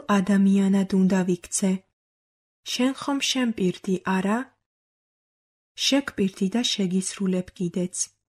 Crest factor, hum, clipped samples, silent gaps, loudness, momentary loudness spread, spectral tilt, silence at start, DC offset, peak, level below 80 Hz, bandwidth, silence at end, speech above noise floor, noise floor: 16 dB; none; under 0.1%; 1.93-2.63 s, 4.66-5.75 s; -24 LUFS; 8 LU; -4.5 dB/octave; 0.1 s; under 0.1%; -10 dBFS; -62 dBFS; 13 kHz; 0.25 s; over 67 dB; under -90 dBFS